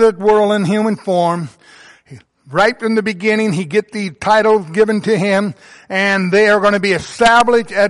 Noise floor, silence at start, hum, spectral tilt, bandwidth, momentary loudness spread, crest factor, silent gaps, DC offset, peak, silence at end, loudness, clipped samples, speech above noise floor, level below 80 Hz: -43 dBFS; 0 s; none; -5.5 dB/octave; 11.5 kHz; 8 LU; 12 dB; none; under 0.1%; -2 dBFS; 0 s; -14 LUFS; under 0.1%; 30 dB; -50 dBFS